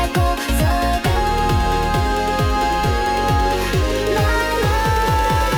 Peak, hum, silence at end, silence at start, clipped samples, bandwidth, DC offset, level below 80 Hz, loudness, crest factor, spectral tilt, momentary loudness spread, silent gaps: -6 dBFS; none; 0 s; 0 s; under 0.1%; 18 kHz; under 0.1%; -24 dBFS; -18 LUFS; 10 dB; -5 dB/octave; 2 LU; none